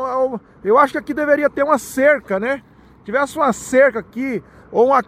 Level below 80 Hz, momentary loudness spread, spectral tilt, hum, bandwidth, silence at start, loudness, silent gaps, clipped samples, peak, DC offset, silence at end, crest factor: -54 dBFS; 10 LU; -5 dB/octave; none; 15.5 kHz; 0 s; -17 LUFS; none; under 0.1%; 0 dBFS; under 0.1%; 0.05 s; 16 dB